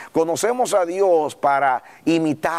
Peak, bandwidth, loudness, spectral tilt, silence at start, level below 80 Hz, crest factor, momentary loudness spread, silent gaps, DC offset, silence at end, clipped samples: -6 dBFS; 15.5 kHz; -19 LUFS; -4.5 dB/octave; 0 s; -64 dBFS; 12 dB; 4 LU; none; 0.1%; 0 s; under 0.1%